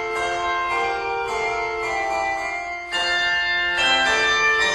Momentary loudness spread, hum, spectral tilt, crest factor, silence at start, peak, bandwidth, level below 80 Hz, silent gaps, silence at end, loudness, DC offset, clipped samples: 8 LU; none; -1 dB/octave; 16 dB; 0 s; -6 dBFS; 13 kHz; -48 dBFS; none; 0 s; -20 LUFS; under 0.1%; under 0.1%